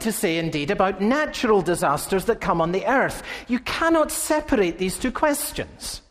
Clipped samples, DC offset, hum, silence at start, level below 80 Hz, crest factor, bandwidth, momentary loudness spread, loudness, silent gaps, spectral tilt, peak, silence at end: under 0.1%; under 0.1%; none; 0 s; -44 dBFS; 16 dB; 15.5 kHz; 7 LU; -22 LUFS; none; -4 dB/octave; -6 dBFS; 0.1 s